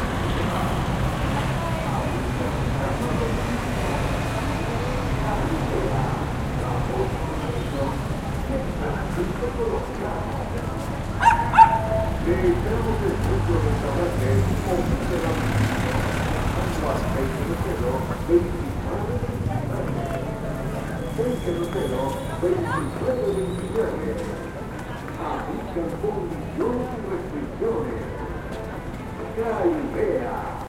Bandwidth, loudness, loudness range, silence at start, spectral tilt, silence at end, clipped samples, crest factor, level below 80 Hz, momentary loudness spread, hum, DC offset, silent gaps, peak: 16.5 kHz; -25 LUFS; 7 LU; 0 s; -6.5 dB/octave; 0 s; under 0.1%; 22 dB; -32 dBFS; 7 LU; none; under 0.1%; none; -2 dBFS